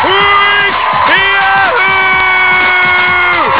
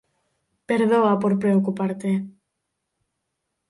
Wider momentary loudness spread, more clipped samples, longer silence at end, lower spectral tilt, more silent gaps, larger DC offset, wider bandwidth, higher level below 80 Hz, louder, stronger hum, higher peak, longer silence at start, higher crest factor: second, 2 LU vs 8 LU; first, 0.2% vs under 0.1%; second, 0 s vs 1.4 s; second, -5.5 dB/octave vs -8 dB/octave; neither; first, 1% vs under 0.1%; second, 4 kHz vs 11.5 kHz; first, -38 dBFS vs -68 dBFS; first, -7 LUFS vs -21 LUFS; neither; first, 0 dBFS vs -8 dBFS; second, 0 s vs 0.7 s; second, 8 dB vs 16 dB